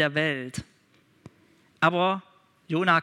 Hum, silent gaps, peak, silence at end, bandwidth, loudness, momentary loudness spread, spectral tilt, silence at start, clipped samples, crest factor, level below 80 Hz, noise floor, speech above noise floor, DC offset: none; none; -4 dBFS; 0 s; 13 kHz; -26 LUFS; 13 LU; -5.5 dB/octave; 0 s; under 0.1%; 24 dB; -66 dBFS; -62 dBFS; 38 dB; under 0.1%